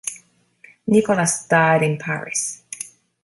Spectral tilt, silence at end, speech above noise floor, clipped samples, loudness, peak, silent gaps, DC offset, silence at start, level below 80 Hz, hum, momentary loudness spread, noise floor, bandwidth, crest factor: -4.5 dB/octave; 0.35 s; 34 dB; under 0.1%; -19 LUFS; -2 dBFS; none; under 0.1%; 0.05 s; -62 dBFS; none; 16 LU; -52 dBFS; 12 kHz; 18 dB